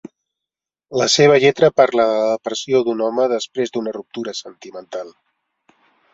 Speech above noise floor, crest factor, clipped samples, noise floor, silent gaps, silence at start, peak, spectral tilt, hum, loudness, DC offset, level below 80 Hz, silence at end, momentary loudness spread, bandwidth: 69 dB; 18 dB; under 0.1%; -86 dBFS; none; 0.9 s; -2 dBFS; -4 dB/octave; none; -17 LUFS; under 0.1%; -62 dBFS; 1.05 s; 19 LU; 7.8 kHz